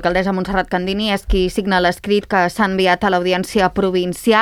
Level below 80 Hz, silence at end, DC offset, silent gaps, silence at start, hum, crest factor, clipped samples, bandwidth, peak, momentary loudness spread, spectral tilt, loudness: -32 dBFS; 0 s; under 0.1%; none; 0 s; none; 16 dB; under 0.1%; 16.5 kHz; -2 dBFS; 4 LU; -5 dB/octave; -17 LUFS